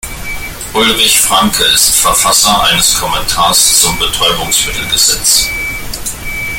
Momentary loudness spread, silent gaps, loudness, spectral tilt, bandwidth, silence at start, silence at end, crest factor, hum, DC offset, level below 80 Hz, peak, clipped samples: 13 LU; none; -8 LUFS; -0.5 dB/octave; over 20 kHz; 0.05 s; 0 s; 12 dB; none; under 0.1%; -28 dBFS; 0 dBFS; 0.2%